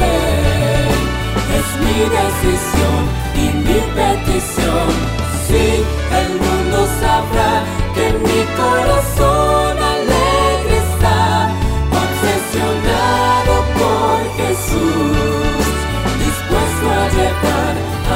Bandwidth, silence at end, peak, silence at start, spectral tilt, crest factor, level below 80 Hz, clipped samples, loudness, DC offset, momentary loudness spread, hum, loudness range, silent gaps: 16.5 kHz; 0 s; 0 dBFS; 0 s; -5 dB/octave; 14 dB; -22 dBFS; under 0.1%; -15 LUFS; under 0.1%; 4 LU; none; 2 LU; none